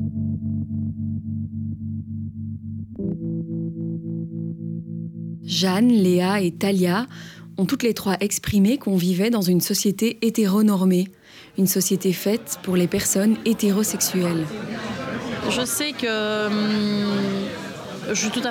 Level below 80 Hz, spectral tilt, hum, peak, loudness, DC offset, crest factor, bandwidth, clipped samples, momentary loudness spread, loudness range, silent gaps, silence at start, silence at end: -54 dBFS; -5 dB/octave; none; -8 dBFS; -22 LUFS; under 0.1%; 14 dB; 17.5 kHz; under 0.1%; 12 LU; 9 LU; none; 0 s; 0 s